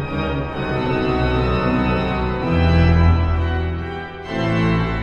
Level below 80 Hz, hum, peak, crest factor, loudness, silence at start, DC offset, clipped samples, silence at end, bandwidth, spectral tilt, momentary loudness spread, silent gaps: -26 dBFS; none; -4 dBFS; 14 dB; -19 LUFS; 0 s; under 0.1%; under 0.1%; 0 s; 6.8 kHz; -8.5 dB/octave; 9 LU; none